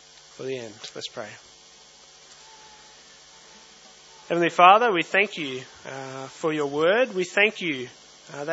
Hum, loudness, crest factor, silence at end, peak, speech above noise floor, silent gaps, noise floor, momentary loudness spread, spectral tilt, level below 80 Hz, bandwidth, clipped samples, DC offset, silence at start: none; -22 LUFS; 26 dB; 0 s; 0 dBFS; 28 dB; none; -51 dBFS; 22 LU; -4 dB/octave; -74 dBFS; 8 kHz; under 0.1%; under 0.1%; 0.4 s